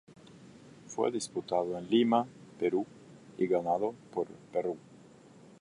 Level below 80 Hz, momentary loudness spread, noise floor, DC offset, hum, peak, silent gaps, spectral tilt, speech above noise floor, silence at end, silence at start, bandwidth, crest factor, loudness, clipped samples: -74 dBFS; 14 LU; -56 dBFS; under 0.1%; none; -14 dBFS; none; -5.5 dB/octave; 25 dB; 0.65 s; 0.1 s; 11.5 kHz; 20 dB; -32 LUFS; under 0.1%